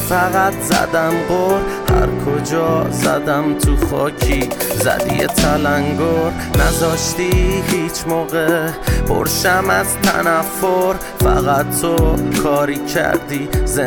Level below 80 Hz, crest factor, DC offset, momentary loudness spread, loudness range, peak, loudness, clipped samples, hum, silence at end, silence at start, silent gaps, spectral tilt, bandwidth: -24 dBFS; 12 dB; under 0.1%; 4 LU; 1 LU; -4 dBFS; -16 LUFS; under 0.1%; none; 0 s; 0 s; none; -4.5 dB/octave; over 20 kHz